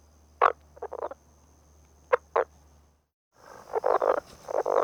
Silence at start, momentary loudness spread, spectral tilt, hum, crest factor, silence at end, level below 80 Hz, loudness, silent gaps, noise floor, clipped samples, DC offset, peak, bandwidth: 0.4 s; 15 LU; -4.5 dB/octave; none; 24 dB; 0 s; -62 dBFS; -29 LUFS; 3.14-3.31 s; -60 dBFS; under 0.1%; under 0.1%; -6 dBFS; 15.5 kHz